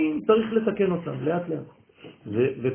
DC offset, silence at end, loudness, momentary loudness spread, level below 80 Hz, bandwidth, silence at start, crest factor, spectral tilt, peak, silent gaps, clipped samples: under 0.1%; 0 s; -25 LUFS; 12 LU; -60 dBFS; 3.4 kHz; 0 s; 18 dB; -11.5 dB/octave; -8 dBFS; none; under 0.1%